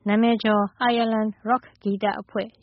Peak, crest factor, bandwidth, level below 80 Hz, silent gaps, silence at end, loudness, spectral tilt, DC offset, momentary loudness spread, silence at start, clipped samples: -8 dBFS; 14 dB; 5.8 kHz; -64 dBFS; none; 0.15 s; -23 LUFS; -4 dB/octave; under 0.1%; 9 LU; 0.05 s; under 0.1%